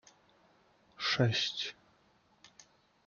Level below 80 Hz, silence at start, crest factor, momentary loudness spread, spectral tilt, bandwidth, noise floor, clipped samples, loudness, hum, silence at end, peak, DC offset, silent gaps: -74 dBFS; 1 s; 22 dB; 10 LU; -4.5 dB/octave; 7.2 kHz; -69 dBFS; under 0.1%; -33 LUFS; none; 0.6 s; -16 dBFS; under 0.1%; none